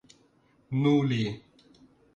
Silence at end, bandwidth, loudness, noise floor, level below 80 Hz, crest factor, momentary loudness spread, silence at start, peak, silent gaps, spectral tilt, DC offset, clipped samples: 0.75 s; 7.6 kHz; -27 LUFS; -64 dBFS; -64 dBFS; 16 dB; 11 LU; 0.7 s; -14 dBFS; none; -7.5 dB/octave; under 0.1%; under 0.1%